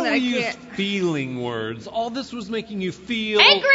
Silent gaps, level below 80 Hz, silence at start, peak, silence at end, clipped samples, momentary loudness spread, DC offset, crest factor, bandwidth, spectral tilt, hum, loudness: none; -58 dBFS; 0 s; -2 dBFS; 0 s; under 0.1%; 15 LU; under 0.1%; 20 dB; 8 kHz; -4 dB/octave; none; -22 LUFS